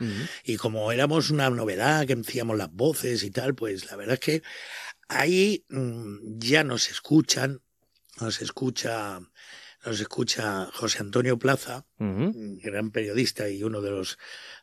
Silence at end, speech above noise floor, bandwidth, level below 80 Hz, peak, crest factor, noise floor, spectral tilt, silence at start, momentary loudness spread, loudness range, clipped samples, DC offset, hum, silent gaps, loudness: 0.05 s; 35 dB; 15 kHz; -70 dBFS; -6 dBFS; 22 dB; -62 dBFS; -4.5 dB/octave; 0 s; 15 LU; 5 LU; under 0.1%; under 0.1%; none; none; -27 LUFS